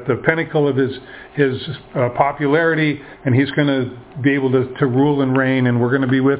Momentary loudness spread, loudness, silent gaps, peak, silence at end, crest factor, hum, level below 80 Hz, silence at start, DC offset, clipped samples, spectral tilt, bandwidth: 7 LU; -18 LUFS; none; 0 dBFS; 0 s; 16 dB; none; -52 dBFS; 0 s; under 0.1%; under 0.1%; -11 dB/octave; 4 kHz